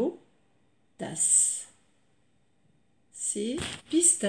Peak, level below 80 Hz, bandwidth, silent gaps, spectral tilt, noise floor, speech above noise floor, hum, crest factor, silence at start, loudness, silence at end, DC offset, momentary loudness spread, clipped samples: -8 dBFS; -66 dBFS; 10.5 kHz; none; -2 dB/octave; -71 dBFS; 44 dB; none; 22 dB; 0 s; -25 LUFS; 0 s; under 0.1%; 17 LU; under 0.1%